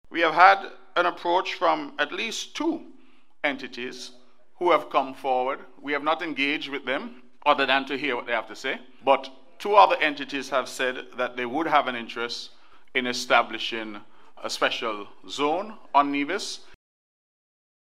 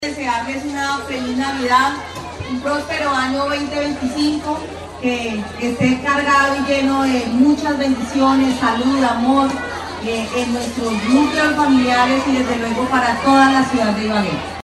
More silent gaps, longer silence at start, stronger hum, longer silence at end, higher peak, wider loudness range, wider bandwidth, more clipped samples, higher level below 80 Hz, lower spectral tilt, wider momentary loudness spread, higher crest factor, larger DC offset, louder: neither; about the same, 0.1 s vs 0 s; neither; first, 1.25 s vs 0.05 s; about the same, -2 dBFS vs -2 dBFS; about the same, 5 LU vs 5 LU; first, 15 kHz vs 12.5 kHz; neither; second, -72 dBFS vs -44 dBFS; second, -2.5 dB/octave vs -4.5 dB/octave; first, 14 LU vs 9 LU; first, 24 dB vs 16 dB; first, 0.5% vs under 0.1%; second, -25 LUFS vs -17 LUFS